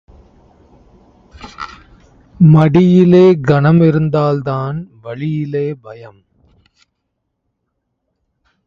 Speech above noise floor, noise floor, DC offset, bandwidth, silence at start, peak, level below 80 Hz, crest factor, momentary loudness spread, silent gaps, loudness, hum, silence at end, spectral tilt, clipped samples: 60 dB; -71 dBFS; under 0.1%; 7 kHz; 1.4 s; 0 dBFS; -46 dBFS; 14 dB; 21 LU; none; -12 LUFS; none; 2.6 s; -9.5 dB/octave; under 0.1%